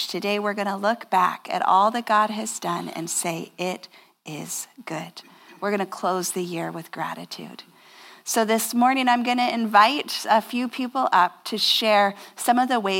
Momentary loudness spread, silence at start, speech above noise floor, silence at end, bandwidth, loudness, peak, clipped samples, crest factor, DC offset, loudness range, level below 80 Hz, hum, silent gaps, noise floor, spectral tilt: 14 LU; 0 s; 25 dB; 0 s; 17 kHz; -23 LUFS; -4 dBFS; under 0.1%; 20 dB; under 0.1%; 9 LU; -88 dBFS; none; none; -48 dBFS; -3 dB/octave